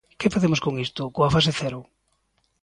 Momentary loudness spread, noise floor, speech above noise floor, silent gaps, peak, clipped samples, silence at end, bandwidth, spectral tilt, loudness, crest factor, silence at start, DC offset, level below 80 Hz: 10 LU; -70 dBFS; 47 dB; none; -6 dBFS; under 0.1%; 0.8 s; 11 kHz; -5.5 dB/octave; -23 LUFS; 18 dB; 0.2 s; under 0.1%; -48 dBFS